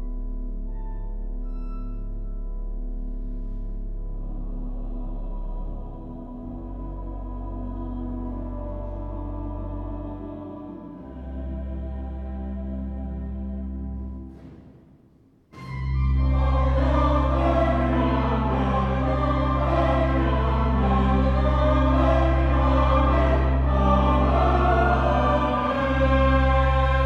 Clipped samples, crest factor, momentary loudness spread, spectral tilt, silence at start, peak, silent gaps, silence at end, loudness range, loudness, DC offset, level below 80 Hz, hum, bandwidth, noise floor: under 0.1%; 16 dB; 16 LU; -8.5 dB/octave; 0 s; -6 dBFS; none; 0 s; 15 LU; -23 LUFS; under 0.1%; -26 dBFS; none; 5.6 kHz; -56 dBFS